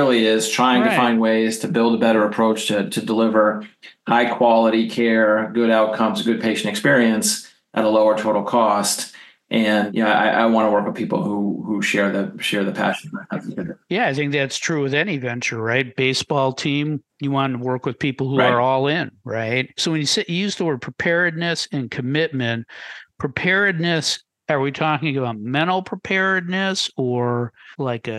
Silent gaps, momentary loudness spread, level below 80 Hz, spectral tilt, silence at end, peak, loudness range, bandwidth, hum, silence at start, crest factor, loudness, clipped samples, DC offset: none; 9 LU; -64 dBFS; -4.5 dB/octave; 0 s; -4 dBFS; 4 LU; 12.5 kHz; none; 0 s; 16 dB; -19 LUFS; under 0.1%; under 0.1%